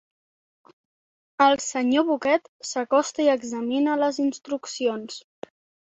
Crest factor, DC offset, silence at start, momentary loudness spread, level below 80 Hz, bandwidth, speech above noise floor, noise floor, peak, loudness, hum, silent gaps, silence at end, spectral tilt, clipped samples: 20 dB; under 0.1%; 1.4 s; 18 LU; -72 dBFS; 8.2 kHz; over 67 dB; under -90 dBFS; -4 dBFS; -23 LUFS; none; 2.49-2.60 s; 0.75 s; -2.5 dB/octave; under 0.1%